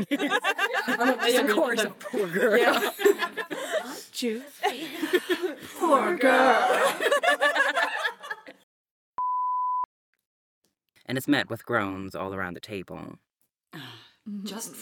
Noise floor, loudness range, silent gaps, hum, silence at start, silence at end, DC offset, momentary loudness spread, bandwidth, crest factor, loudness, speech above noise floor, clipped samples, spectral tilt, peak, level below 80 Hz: -50 dBFS; 8 LU; 8.63-9.14 s, 9.85-10.13 s, 10.26-10.62 s; none; 0 s; 0 s; under 0.1%; 17 LU; 19 kHz; 20 dB; -25 LUFS; 24 dB; under 0.1%; -3.5 dB/octave; -8 dBFS; -74 dBFS